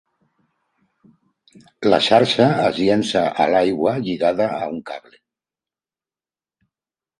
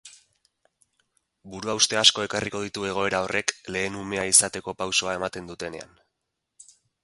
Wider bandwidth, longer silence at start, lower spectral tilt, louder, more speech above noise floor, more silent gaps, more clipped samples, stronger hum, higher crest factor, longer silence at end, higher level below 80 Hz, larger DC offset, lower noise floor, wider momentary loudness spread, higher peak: about the same, 11 kHz vs 12 kHz; first, 1.8 s vs 0.05 s; first, -5.5 dB/octave vs -1 dB/octave; first, -18 LUFS vs -23 LUFS; first, over 72 dB vs 55 dB; neither; neither; neither; second, 20 dB vs 28 dB; first, 2.2 s vs 1.2 s; about the same, -58 dBFS vs -58 dBFS; neither; first, under -90 dBFS vs -81 dBFS; second, 13 LU vs 17 LU; about the same, 0 dBFS vs 0 dBFS